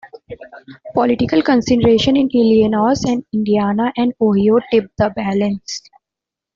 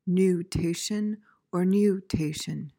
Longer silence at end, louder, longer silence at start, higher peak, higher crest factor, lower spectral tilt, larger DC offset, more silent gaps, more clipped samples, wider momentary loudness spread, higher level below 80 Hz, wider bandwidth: first, 0.75 s vs 0.1 s; first, -15 LUFS vs -27 LUFS; about the same, 0.05 s vs 0.05 s; first, -2 dBFS vs -12 dBFS; about the same, 14 dB vs 14 dB; about the same, -6 dB/octave vs -6 dB/octave; neither; neither; neither; first, 14 LU vs 10 LU; about the same, -46 dBFS vs -50 dBFS; second, 7.6 kHz vs 17 kHz